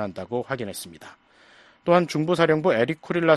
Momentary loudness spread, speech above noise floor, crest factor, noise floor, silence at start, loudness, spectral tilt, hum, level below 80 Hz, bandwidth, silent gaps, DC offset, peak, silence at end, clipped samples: 13 LU; 31 dB; 20 dB; -54 dBFS; 0 s; -23 LUFS; -6 dB/octave; none; -62 dBFS; 13 kHz; none; under 0.1%; -4 dBFS; 0 s; under 0.1%